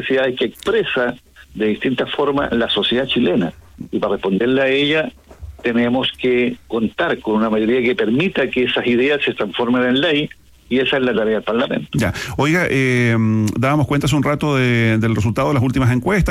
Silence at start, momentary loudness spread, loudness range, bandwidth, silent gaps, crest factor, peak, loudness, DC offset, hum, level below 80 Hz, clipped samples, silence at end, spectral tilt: 0 s; 6 LU; 2 LU; 15.5 kHz; none; 10 dB; -6 dBFS; -17 LUFS; under 0.1%; none; -40 dBFS; under 0.1%; 0 s; -6 dB/octave